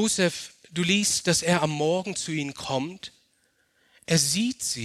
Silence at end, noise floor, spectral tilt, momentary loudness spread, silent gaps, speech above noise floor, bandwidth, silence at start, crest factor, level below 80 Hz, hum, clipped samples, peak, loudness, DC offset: 0 s; -68 dBFS; -3.5 dB/octave; 14 LU; none; 43 dB; 14.5 kHz; 0 s; 20 dB; -62 dBFS; none; under 0.1%; -8 dBFS; -25 LUFS; under 0.1%